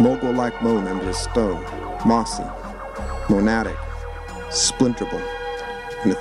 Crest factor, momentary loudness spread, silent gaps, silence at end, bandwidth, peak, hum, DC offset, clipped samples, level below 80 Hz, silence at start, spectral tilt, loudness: 18 dB; 14 LU; none; 0 s; 12.5 kHz; -4 dBFS; none; under 0.1%; under 0.1%; -36 dBFS; 0 s; -4.5 dB/octave; -22 LUFS